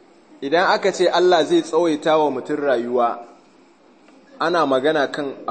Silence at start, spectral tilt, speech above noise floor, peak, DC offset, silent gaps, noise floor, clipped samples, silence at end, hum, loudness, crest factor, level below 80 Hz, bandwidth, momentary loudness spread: 0.4 s; -4.5 dB/octave; 33 dB; -2 dBFS; under 0.1%; none; -52 dBFS; under 0.1%; 0 s; none; -19 LUFS; 16 dB; -74 dBFS; 8.8 kHz; 8 LU